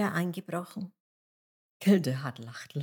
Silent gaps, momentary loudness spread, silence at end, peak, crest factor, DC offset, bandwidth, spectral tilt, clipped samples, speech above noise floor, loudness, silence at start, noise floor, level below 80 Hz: 1.00-1.80 s; 17 LU; 0 s; -12 dBFS; 20 dB; under 0.1%; 18.5 kHz; -6.5 dB/octave; under 0.1%; over 60 dB; -30 LUFS; 0 s; under -90 dBFS; -86 dBFS